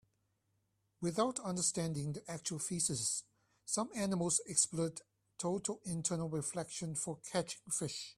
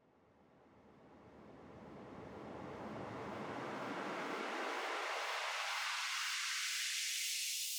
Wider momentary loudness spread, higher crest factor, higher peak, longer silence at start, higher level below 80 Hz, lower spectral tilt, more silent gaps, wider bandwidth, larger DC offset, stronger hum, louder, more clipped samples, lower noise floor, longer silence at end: second, 9 LU vs 18 LU; first, 24 dB vs 16 dB; first, -14 dBFS vs -26 dBFS; first, 1 s vs 0.4 s; first, -72 dBFS vs -78 dBFS; first, -4 dB/octave vs -1 dB/octave; neither; second, 15 kHz vs over 20 kHz; neither; neither; first, -37 LUFS vs -40 LUFS; neither; first, -81 dBFS vs -69 dBFS; about the same, 0.05 s vs 0 s